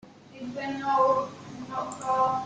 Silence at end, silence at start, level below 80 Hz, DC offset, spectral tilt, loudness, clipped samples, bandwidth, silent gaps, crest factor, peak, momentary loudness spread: 0 s; 0.05 s; -66 dBFS; under 0.1%; -5 dB/octave; -28 LUFS; under 0.1%; 9.4 kHz; none; 18 dB; -10 dBFS; 16 LU